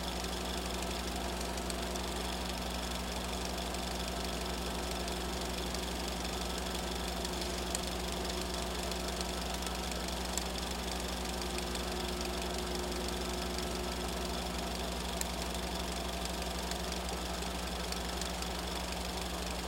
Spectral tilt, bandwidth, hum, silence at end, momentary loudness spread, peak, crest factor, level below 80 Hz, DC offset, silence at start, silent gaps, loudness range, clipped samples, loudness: -3.5 dB/octave; 17 kHz; 60 Hz at -40 dBFS; 0 s; 1 LU; -14 dBFS; 24 dB; -44 dBFS; under 0.1%; 0 s; none; 1 LU; under 0.1%; -37 LUFS